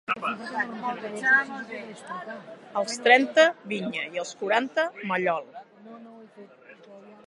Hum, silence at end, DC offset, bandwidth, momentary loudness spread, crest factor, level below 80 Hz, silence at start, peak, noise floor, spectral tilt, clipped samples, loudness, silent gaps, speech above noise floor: none; 0.1 s; under 0.1%; 11.5 kHz; 21 LU; 24 dB; -82 dBFS; 0.1 s; -4 dBFS; -50 dBFS; -3.5 dB/octave; under 0.1%; -25 LUFS; none; 24 dB